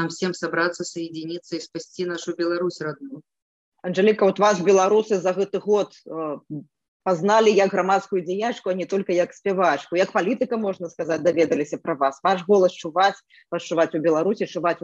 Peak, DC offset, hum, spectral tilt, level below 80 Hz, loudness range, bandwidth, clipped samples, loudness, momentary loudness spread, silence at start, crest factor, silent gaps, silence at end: -6 dBFS; under 0.1%; none; -5 dB/octave; -72 dBFS; 5 LU; 8.2 kHz; under 0.1%; -22 LUFS; 14 LU; 0 s; 16 dB; 3.42-3.72 s, 6.88-7.00 s; 0.05 s